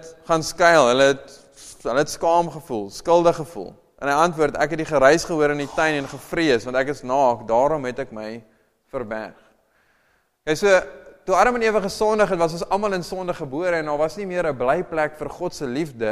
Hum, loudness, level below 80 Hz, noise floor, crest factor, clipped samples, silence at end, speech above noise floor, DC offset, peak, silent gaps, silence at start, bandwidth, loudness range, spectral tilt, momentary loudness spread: none; -21 LUFS; -48 dBFS; -64 dBFS; 20 dB; under 0.1%; 0 s; 44 dB; under 0.1%; 0 dBFS; none; 0 s; 15 kHz; 5 LU; -4.5 dB/octave; 15 LU